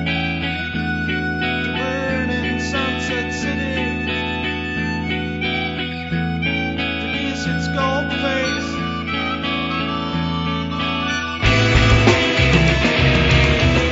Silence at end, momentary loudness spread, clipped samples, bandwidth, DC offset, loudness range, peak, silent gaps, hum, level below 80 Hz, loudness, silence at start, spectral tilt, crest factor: 0 s; 8 LU; under 0.1%; 8 kHz; under 0.1%; 6 LU; -2 dBFS; none; none; -30 dBFS; -19 LUFS; 0 s; -5.5 dB/octave; 18 dB